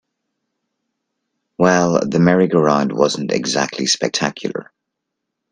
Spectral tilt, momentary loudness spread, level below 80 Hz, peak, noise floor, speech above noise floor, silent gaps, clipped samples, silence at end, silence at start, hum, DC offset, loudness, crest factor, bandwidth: -4.5 dB/octave; 8 LU; -56 dBFS; 0 dBFS; -78 dBFS; 62 dB; none; under 0.1%; 0.9 s; 1.6 s; none; under 0.1%; -16 LUFS; 18 dB; 10.5 kHz